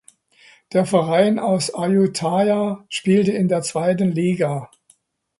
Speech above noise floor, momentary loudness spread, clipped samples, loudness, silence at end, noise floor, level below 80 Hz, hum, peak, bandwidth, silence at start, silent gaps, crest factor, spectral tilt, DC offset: 41 dB; 6 LU; under 0.1%; -19 LUFS; 0.75 s; -59 dBFS; -62 dBFS; none; -2 dBFS; 11.5 kHz; 0.7 s; none; 16 dB; -6 dB/octave; under 0.1%